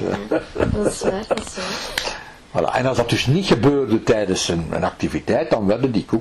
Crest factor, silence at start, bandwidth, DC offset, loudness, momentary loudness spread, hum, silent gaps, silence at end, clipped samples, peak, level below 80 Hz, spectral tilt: 14 dB; 0 s; 14.5 kHz; under 0.1%; -20 LUFS; 8 LU; none; none; 0 s; under 0.1%; -6 dBFS; -40 dBFS; -5 dB/octave